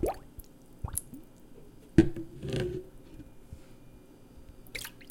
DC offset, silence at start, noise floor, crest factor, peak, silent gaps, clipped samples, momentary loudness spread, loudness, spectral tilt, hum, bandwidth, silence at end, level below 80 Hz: under 0.1%; 0 s; -53 dBFS; 30 dB; -6 dBFS; none; under 0.1%; 29 LU; -33 LUFS; -6 dB/octave; none; 17 kHz; 0 s; -46 dBFS